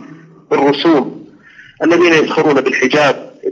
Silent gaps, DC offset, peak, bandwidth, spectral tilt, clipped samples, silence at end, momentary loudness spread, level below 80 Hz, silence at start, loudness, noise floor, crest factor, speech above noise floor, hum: none; under 0.1%; 0 dBFS; 7.6 kHz; -5 dB/octave; under 0.1%; 0 s; 8 LU; -66 dBFS; 0 s; -12 LUFS; -41 dBFS; 14 dB; 30 dB; none